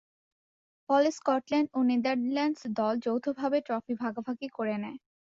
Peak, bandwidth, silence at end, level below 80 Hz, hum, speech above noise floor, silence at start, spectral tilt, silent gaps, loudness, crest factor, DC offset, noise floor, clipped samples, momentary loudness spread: -14 dBFS; 7.8 kHz; 0.35 s; -76 dBFS; none; over 61 dB; 0.9 s; -5.5 dB/octave; none; -30 LUFS; 16 dB; under 0.1%; under -90 dBFS; under 0.1%; 9 LU